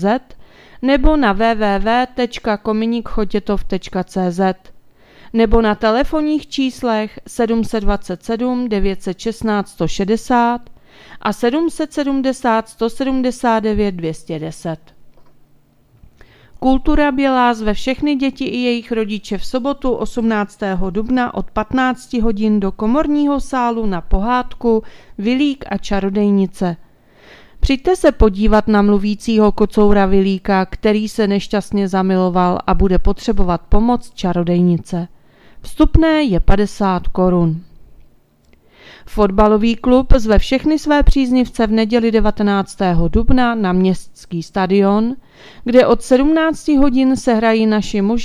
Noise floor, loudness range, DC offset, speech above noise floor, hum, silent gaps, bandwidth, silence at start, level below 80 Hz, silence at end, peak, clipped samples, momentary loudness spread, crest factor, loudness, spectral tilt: -51 dBFS; 5 LU; under 0.1%; 37 dB; none; none; 12.5 kHz; 0 s; -26 dBFS; 0 s; 0 dBFS; under 0.1%; 9 LU; 14 dB; -16 LUFS; -6.5 dB/octave